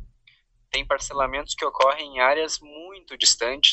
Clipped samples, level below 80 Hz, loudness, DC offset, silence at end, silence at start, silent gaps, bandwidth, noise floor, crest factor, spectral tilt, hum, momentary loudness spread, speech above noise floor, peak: under 0.1%; -48 dBFS; -22 LUFS; under 0.1%; 0 s; 0 s; none; 8.6 kHz; -60 dBFS; 24 dB; 0.5 dB/octave; none; 14 LU; 37 dB; 0 dBFS